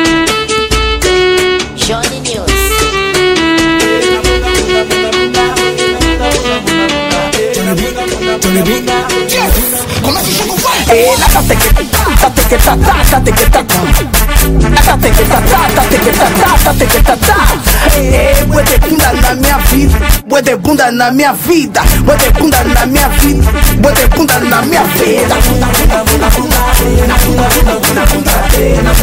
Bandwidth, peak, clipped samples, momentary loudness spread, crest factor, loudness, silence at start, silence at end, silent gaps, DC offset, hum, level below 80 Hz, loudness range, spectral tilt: 16.5 kHz; 0 dBFS; 0.3%; 4 LU; 8 dB; -9 LUFS; 0 s; 0 s; none; under 0.1%; none; -14 dBFS; 3 LU; -4 dB/octave